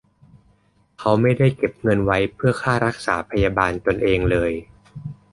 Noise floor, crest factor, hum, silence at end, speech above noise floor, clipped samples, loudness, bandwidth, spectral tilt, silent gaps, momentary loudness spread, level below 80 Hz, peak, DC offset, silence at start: -60 dBFS; 18 dB; none; 0.2 s; 40 dB; under 0.1%; -20 LUFS; 11.5 kHz; -7 dB/octave; none; 8 LU; -38 dBFS; -2 dBFS; under 0.1%; 1 s